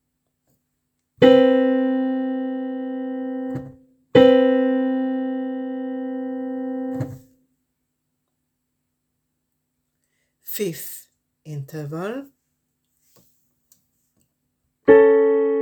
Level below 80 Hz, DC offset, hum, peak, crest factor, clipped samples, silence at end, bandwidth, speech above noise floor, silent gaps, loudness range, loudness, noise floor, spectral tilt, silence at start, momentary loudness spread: -62 dBFS; under 0.1%; none; 0 dBFS; 22 dB; under 0.1%; 0 s; over 20 kHz; 47 dB; none; 16 LU; -20 LUFS; -76 dBFS; -6 dB/octave; 1.2 s; 19 LU